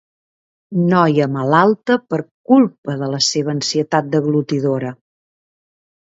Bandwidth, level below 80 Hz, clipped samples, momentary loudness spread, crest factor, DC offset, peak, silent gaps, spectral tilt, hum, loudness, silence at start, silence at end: 7.8 kHz; -64 dBFS; under 0.1%; 10 LU; 18 dB; under 0.1%; 0 dBFS; 2.31-2.44 s, 2.78-2.83 s; -5.5 dB/octave; none; -16 LUFS; 0.7 s; 1.1 s